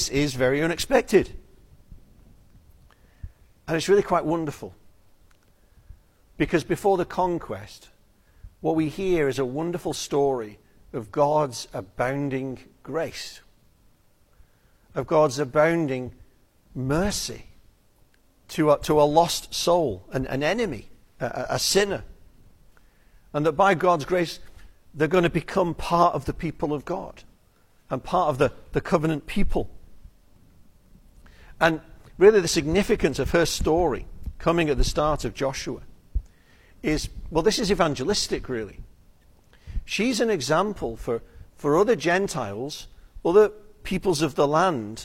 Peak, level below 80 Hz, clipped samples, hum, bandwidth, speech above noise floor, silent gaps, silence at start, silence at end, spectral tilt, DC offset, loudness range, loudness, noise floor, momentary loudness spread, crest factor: -4 dBFS; -40 dBFS; under 0.1%; none; 16.5 kHz; 36 dB; none; 0 s; 0 s; -5 dB/octave; under 0.1%; 5 LU; -24 LUFS; -59 dBFS; 15 LU; 22 dB